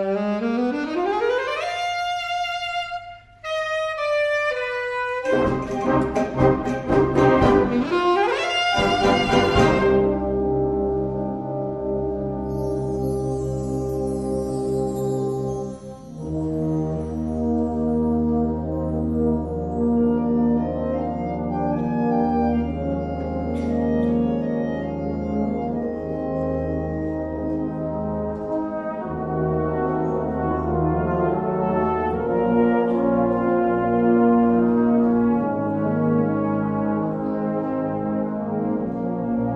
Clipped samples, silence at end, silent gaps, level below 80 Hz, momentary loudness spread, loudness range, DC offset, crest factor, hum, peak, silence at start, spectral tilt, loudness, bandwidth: under 0.1%; 0 s; none; -38 dBFS; 8 LU; 7 LU; under 0.1%; 18 dB; none; -2 dBFS; 0 s; -7 dB/octave; -22 LUFS; 11.5 kHz